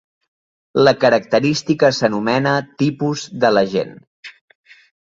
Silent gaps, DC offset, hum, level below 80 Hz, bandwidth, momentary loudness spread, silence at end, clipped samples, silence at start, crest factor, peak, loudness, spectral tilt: 4.07-4.23 s; under 0.1%; none; -58 dBFS; 7.8 kHz; 8 LU; 0.75 s; under 0.1%; 0.75 s; 16 dB; -2 dBFS; -17 LUFS; -5.5 dB/octave